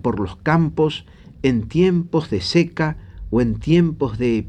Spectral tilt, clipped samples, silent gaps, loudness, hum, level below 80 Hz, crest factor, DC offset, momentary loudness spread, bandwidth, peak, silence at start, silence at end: -7 dB/octave; under 0.1%; none; -19 LUFS; none; -38 dBFS; 16 dB; under 0.1%; 6 LU; 9 kHz; -4 dBFS; 0.05 s; 0 s